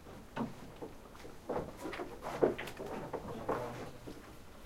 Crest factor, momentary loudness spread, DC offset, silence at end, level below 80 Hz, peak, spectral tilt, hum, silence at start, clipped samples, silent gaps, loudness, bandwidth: 28 dB; 17 LU; under 0.1%; 0 s; -58 dBFS; -14 dBFS; -6 dB/octave; none; 0 s; under 0.1%; none; -41 LUFS; 16 kHz